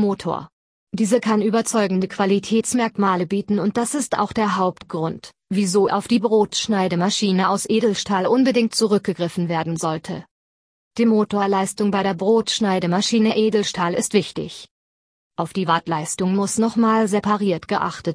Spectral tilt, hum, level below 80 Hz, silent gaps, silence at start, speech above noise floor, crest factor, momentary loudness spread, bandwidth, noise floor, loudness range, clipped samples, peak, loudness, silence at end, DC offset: -5 dB/octave; none; -58 dBFS; 0.53-0.87 s, 10.31-10.91 s, 14.71-15.31 s; 0 s; over 70 dB; 16 dB; 9 LU; 11 kHz; under -90 dBFS; 3 LU; under 0.1%; -4 dBFS; -20 LUFS; 0 s; under 0.1%